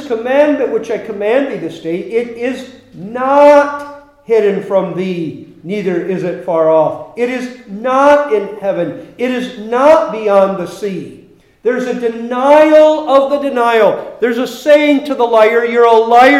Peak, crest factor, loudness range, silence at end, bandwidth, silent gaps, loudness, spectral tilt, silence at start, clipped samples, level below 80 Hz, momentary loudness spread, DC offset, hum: 0 dBFS; 12 dB; 5 LU; 0 s; 13.5 kHz; none; -12 LUFS; -6 dB/octave; 0 s; 0.2%; -56 dBFS; 14 LU; under 0.1%; none